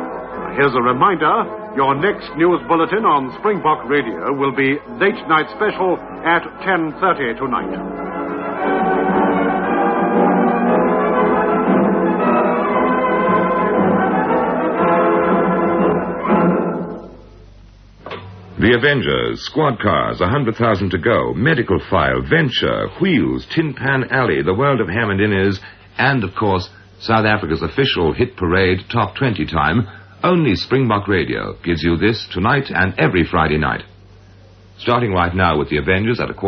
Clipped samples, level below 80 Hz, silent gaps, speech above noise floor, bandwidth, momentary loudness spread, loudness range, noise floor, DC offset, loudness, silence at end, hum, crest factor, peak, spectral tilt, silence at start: under 0.1%; -40 dBFS; none; 27 dB; 6.6 kHz; 6 LU; 3 LU; -44 dBFS; under 0.1%; -17 LUFS; 0 s; none; 16 dB; 0 dBFS; -8 dB/octave; 0 s